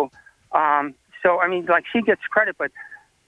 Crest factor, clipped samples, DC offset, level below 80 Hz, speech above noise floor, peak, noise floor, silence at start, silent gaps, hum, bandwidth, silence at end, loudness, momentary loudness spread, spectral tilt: 18 dB; under 0.1%; under 0.1%; -64 dBFS; 20 dB; -4 dBFS; -40 dBFS; 0 s; none; none; 10 kHz; 0.3 s; -21 LUFS; 11 LU; -6.5 dB/octave